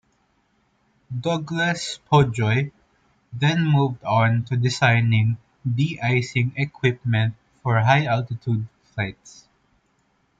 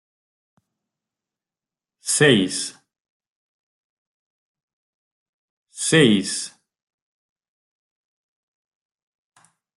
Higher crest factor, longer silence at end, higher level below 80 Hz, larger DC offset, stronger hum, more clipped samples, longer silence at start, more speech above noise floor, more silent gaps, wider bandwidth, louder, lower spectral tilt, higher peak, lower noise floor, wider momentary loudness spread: second, 18 dB vs 24 dB; second, 1.1 s vs 3.3 s; first, -54 dBFS vs -66 dBFS; neither; neither; neither; second, 1.1 s vs 2.05 s; second, 45 dB vs over 73 dB; second, none vs 3.00-3.20 s, 3.27-4.55 s, 4.63-5.66 s; second, 9 kHz vs 12 kHz; second, -22 LUFS vs -18 LUFS; first, -6.5 dB/octave vs -3.5 dB/octave; about the same, -4 dBFS vs -2 dBFS; second, -66 dBFS vs under -90 dBFS; second, 11 LU vs 16 LU